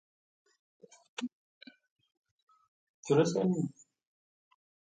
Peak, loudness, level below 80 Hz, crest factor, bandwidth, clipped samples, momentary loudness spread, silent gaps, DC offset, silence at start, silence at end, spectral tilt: -14 dBFS; -32 LUFS; -80 dBFS; 24 dB; 9.4 kHz; under 0.1%; 18 LU; 1.33-1.61 s, 1.91-1.96 s, 2.17-2.23 s, 2.31-2.47 s, 2.68-3.03 s; under 0.1%; 1.2 s; 1.25 s; -6.5 dB/octave